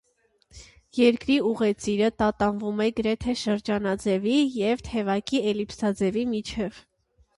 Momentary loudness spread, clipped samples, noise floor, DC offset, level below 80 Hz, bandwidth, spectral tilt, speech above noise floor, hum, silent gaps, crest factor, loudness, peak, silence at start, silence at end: 6 LU; under 0.1%; -66 dBFS; under 0.1%; -50 dBFS; 11.5 kHz; -5.5 dB/octave; 41 dB; none; none; 18 dB; -25 LUFS; -6 dBFS; 0.55 s; 0.6 s